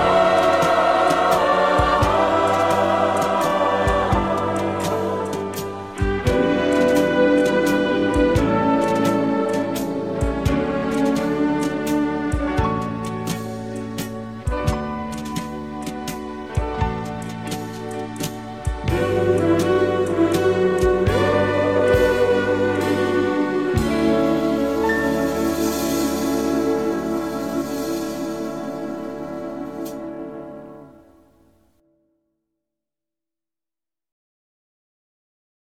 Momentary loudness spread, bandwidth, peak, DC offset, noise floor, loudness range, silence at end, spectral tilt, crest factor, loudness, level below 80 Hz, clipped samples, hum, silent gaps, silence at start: 12 LU; 16.5 kHz; -4 dBFS; 0.3%; under -90 dBFS; 10 LU; 4.7 s; -6 dB/octave; 16 dB; -20 LUFS; -36 dBFS; under 0.1%; none; none; 0 s